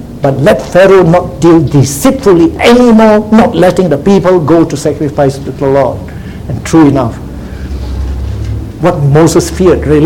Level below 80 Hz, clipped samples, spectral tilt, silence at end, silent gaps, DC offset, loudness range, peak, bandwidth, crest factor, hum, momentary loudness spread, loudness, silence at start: -24 dBFS; 3%; -6.5 dB/octave; 0 s; none; 0.9%; 6 LU; 0 dBFS; 17.5 kHz; 8 dB; none; 14 LU; -7 LUFS; 0 s